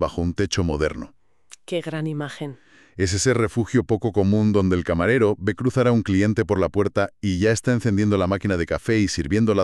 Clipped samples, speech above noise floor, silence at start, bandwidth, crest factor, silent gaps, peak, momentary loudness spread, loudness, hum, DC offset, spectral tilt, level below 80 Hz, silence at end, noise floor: under 0.1%; 31 dB; 0 s; 12 kHz; 16 dB; none; -6 dBFS; 9 LU; -22 LUFS; none; under 0.1%; -6 dB/octave; -42 dBFS; 0 s; -51 dBFS